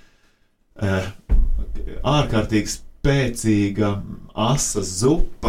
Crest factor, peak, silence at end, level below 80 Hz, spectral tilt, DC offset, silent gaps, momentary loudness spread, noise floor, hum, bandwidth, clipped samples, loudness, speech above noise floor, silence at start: 16 dB; -4 dBFS; 0 s; -26 dBFS; -5 dB/octave; under 0.1%; none; 9 LU; -60 dBFS; none; 15 kHz; under 0.1%; -22 LUFS; 40 dB; 0.75 s